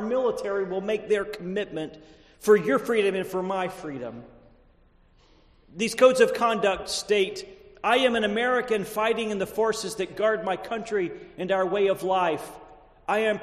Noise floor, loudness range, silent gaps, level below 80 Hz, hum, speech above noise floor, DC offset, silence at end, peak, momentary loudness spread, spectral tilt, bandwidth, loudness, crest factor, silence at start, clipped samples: -59 dBFS; 4 LU; none; -58 dBFS; none; 34 dB; under 0.1%; 0 s; -6 dBFS; 14 LU; -4 dB/octave; 14 kHz; -25 LUFS; 20 dB; 0 s; under 0.1%